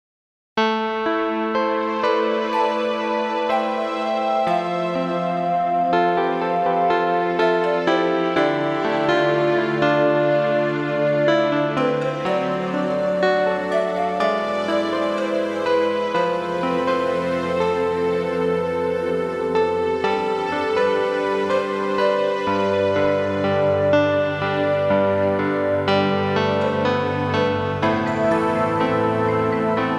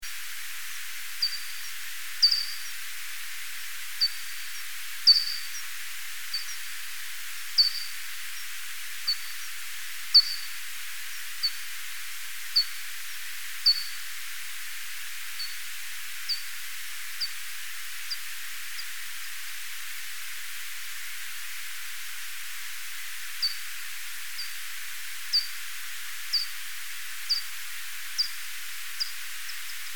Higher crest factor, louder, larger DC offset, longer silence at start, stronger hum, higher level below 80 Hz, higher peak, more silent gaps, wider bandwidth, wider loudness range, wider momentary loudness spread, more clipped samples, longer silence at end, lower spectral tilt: second, 14 dB vs 24 dB; first, -20 LUFS vs -30 LUFS; second, under 0.1% vs 2%; first, 0.55 s vs 0 s; neither; first, -56 dBFS vs -76 dBFS; about the same, -6 dBFS vs -8 dBFS; neither; second, 11 kHz vs 19.5 kHz; second, 2 LU vs 9 LU; second, 4 LU vs 13 LU; neither; about the same, 0 s vs 0 s; first, -6.5 dB/octave vs 3 dB/octave